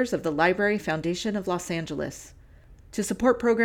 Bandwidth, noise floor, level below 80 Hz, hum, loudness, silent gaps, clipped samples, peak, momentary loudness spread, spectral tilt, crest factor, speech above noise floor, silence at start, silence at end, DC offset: 17.5 kHz; -51 dBFS; -52 dBFS; none; -26 LUFS; none; under 0.1%; -8 dBFS; 11 LU; -5 dB/octave; 18 dB; 25 dB; 0 s; 0 s; under 0.1%